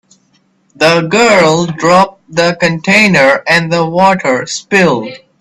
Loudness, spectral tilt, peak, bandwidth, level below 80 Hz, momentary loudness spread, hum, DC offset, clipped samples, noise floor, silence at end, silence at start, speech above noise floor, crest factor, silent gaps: -9 LUFS; -4.5 dB/octave; 0 dBFS; 13.5 kHz; -50 dBFS; 7 LU; none; under 0.1%; 0.1%; -54 dBFS; 0.25 s; 0.8 s; 45 dB; 10 dB; none